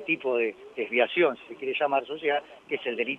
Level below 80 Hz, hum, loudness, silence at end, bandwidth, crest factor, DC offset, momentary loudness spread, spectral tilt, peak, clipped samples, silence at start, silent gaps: -76 dBFS; none; -28 LUFS; 0 s; 6 kHz; 18 dB; under 0.1%; 9 LU; -6 dB/octave; -10 dBFS; under 0.1%; 0 s; none